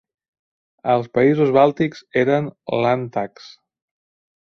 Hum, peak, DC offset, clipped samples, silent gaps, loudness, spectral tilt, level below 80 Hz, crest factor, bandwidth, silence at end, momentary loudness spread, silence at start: none; -2 dBFS; under 0.1%; under 0.1%; none; -19 LUFS; -8 dB/octave; -60 dBFS; 18 dB; 6.6 kHz; 1.15 s; 12 LU; 0.85 s